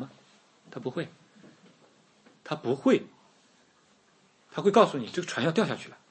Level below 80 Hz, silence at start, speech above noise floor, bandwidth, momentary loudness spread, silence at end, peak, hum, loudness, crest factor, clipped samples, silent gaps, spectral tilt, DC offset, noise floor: -78 dBFS; 0 s; 37 dB; 8.8 kHz; 21 LU; 0.2 s; -6 dBFS; none; -28 LUFS; 24 dB; under 0.1%; none; -5.5 dB/octave; under 0.1%; -64 dBFS